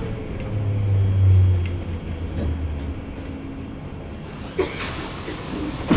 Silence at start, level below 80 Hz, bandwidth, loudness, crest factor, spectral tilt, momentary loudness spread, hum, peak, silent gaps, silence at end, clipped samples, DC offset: 0 s; -30 dBFS; 4 kHz; -25 LUFS; 18 dB; -11.5 dB/octave; 16 LU; none; -4 dBFS; none; 0 s; under 0.1%; under 0.1%